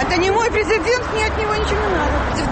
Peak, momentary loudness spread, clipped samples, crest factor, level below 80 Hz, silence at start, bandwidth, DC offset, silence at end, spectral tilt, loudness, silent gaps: -6 dBFS; 3 LU; under 0.1%; 12 dB; -28 dBFS; 0 s; 8.8 kHz; under 0.1%; 0 s; -4.5 dB/octave; -18 LUFS; none